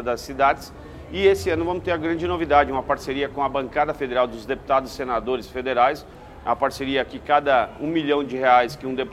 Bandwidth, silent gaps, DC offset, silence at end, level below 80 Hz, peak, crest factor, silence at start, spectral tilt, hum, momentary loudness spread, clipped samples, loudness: 14.5 kHz; none; under 0.1%; 0 s; -44 dBFS; -2 dBFS; 20 dB; 0 s; -5.5 dB/octave; none; 9 LU; under 0.1%; -22 LUFS